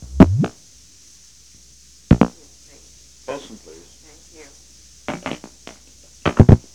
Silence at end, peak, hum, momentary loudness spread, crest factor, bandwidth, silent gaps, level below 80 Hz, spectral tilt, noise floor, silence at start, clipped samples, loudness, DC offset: 0.15 s; 0 dBFS; none; 27 LU; 20 dB; 11.5 kHz; none; -32 dBFS; -7.5 dB/octave; -48 dBFS; 0 s; under 0.1%; -18 LUFS; under 0.1%